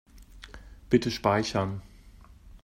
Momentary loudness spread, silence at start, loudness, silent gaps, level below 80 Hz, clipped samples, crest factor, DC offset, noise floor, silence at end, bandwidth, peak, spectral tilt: 23 LU; 0.15 s; -27 LUFS; none; -50 dBFS; under 0.1%; 22 dB; under 0.1%; -52 dBFS; 0.05 s; 16 kHz; -8 dBFS; -5.5 dB/octave